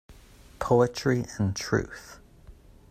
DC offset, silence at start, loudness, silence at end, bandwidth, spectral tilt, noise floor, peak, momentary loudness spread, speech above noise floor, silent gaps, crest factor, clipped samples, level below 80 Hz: under 0.1%; 0.1 s; -27 LUFS; 0.4 s; 15 kHz; -6 dB/octave; -52 dBFS; -8 dBFS; 18 LU; 25 dB; none; 20 dB; under 0.1%; -50 dBFS